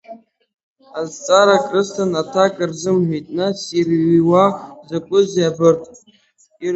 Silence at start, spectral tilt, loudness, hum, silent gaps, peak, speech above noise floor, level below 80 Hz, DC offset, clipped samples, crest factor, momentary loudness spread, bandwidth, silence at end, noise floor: 0.1 s; -5.5 dB/octave; -17 LUFS; none; 0.63-0.76 s; 0 dBFS; 40 dB; -60 dBFS; under 0.1%; under 0.1%; 18 dB; 14 LU; 8.2 kHz; 0 s; -56 dBFS